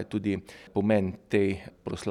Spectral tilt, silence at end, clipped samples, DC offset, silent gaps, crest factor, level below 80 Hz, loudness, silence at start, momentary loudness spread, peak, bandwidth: -7 dB/octave; 0 s; under 0.1%; under 0.1%; none; 18 dB; -58 dBFS; -29 LUFS; 0 s; 10 LU; -12 dBFS; 12 kHz